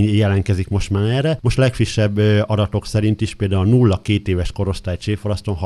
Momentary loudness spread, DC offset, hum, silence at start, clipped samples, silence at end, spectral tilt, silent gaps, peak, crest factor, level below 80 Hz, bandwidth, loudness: 7 LU; under 0.1%; none; 0 s; under 0.1%; 0 s; -7 dB/octave; none; -2 dBFS; 16 dB; -34 dBFS; 11.5 kHz; -18 LUFS